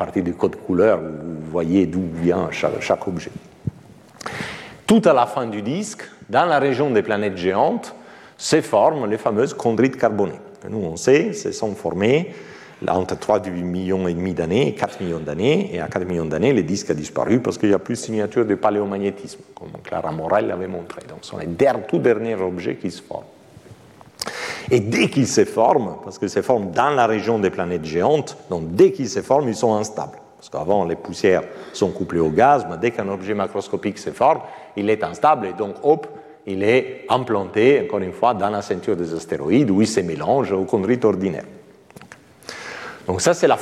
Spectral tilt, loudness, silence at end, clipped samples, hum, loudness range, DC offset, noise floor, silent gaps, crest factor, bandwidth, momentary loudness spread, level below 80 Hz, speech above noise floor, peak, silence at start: -5.5 dB/octave; -20 LUFS; 0 s; under 0.1%; none; 4 LU; under 0.1%; -45 dBFS; none; 18 dB; 13.5 kHz; 14 LU; -54 dBFS; 26 dB; -2 dBFS; 0 s